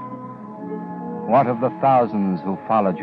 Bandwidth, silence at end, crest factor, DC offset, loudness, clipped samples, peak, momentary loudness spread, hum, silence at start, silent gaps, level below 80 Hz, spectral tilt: 5.2 kHz; 0 s; 16 dB; under 0.1%; -20 LUFS; under 0.1%; -6 dBFS; 17 LU; none; 0 s; none; -68 dBFS; -10.5 dB/octave